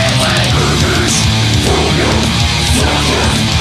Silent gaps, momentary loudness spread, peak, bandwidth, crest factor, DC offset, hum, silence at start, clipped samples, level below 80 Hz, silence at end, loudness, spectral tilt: none; 1 LU; 0 dBFS; 15 kHz; 12 dB; under 0.1%; none; 0 s; under 0.1%; -22 dBFS; 0 s; -11 LUFS; -4 dB/octave